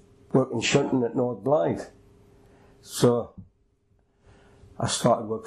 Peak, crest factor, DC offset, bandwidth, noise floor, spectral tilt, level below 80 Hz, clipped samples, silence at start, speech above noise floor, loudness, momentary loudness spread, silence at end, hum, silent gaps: -10 dBFS; 18 dB; under 0.1%; 13 kHz; -66 dBFS; -5 dB/octave; -58 dBFS; under 0.1%; 0.35 s; 42 dB; -25 LUFS; 11 LU; 0 s; none; none